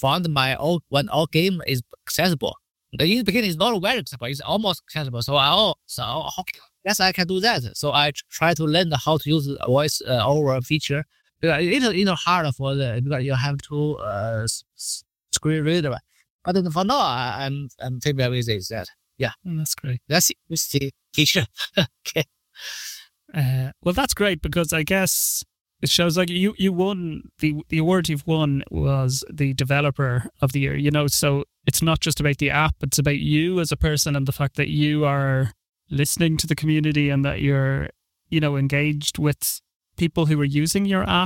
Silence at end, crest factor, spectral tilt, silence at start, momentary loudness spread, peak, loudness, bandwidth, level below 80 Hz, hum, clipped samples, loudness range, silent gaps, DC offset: 0 s; 18 dB; -4.5 dB/octave; 0 s; 9 LU; -4 dBFS; -22 LUFS; 17 kHz; -44 dBFS; none; under 0.1%; 3 LU; 16.30-16.39 s, 25.61-25.65 s, 35.69-35.73 s, 39.76-39.80 s; under 0.1%